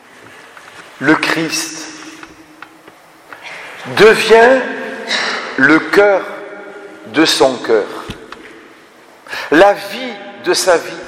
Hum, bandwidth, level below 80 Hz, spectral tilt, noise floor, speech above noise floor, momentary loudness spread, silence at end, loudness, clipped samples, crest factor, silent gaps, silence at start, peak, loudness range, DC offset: none; 16 kHz; -50 dBFS; -3 dB/octave; -42 dBFS; 31 dB; 22 LU; 0 s; -12 LUFS; under 0.1%; 14 dB; none; 0.75 s; 0 dBFS; 8 LU; under 0.1%